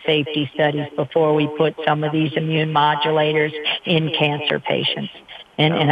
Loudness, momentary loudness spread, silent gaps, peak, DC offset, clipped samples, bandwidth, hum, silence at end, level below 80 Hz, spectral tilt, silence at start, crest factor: -19 LUFS; 5 LU; none; 0 dBFS; under 0.1%; under 0.1%; 5 kHz; none; 0 s; -62 dBFS; -7.5 dB/octave; 0 s; 18 dB